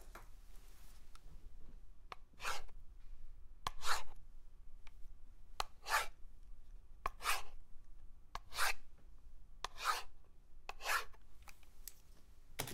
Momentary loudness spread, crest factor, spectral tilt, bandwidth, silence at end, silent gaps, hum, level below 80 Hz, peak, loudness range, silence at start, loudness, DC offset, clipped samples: 26 LU; 24 dB; -1 dB/octave; 16 kHz; 0 s; none; none; -54 dBFS; -18 dBFS; 6 LU; 0 s; -42 LUFS; under 0.1%; under 0.1%